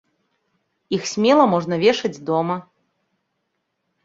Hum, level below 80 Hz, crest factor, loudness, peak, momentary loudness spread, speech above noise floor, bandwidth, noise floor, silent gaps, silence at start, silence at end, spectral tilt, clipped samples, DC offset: none; -64 dBFS; 20 dB; -19 LUFS; -2 dBFS; 11 LU; 56 dB; 7.8 kHz; -74 dBFS; none; 0.9 s; 1.45 s; -5 dB/octave; under 0.1%; under 0.1%